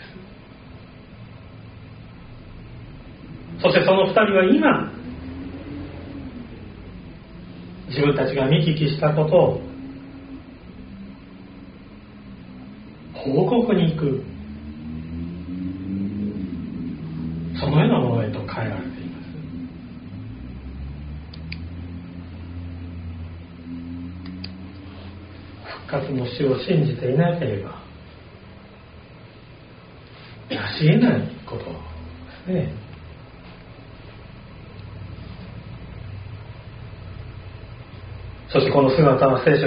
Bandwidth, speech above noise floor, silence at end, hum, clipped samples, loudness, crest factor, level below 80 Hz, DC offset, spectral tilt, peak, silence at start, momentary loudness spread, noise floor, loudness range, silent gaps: 5.2 kHz; 25 dB; 0 s; none; under 0.1%; -22 LUFS; 22 dB; -46 dBFS; under 0.1%; -6 dB/octave; -2 dBFS; 0 s; 25 LU; -44 dBFS; 18 LU; none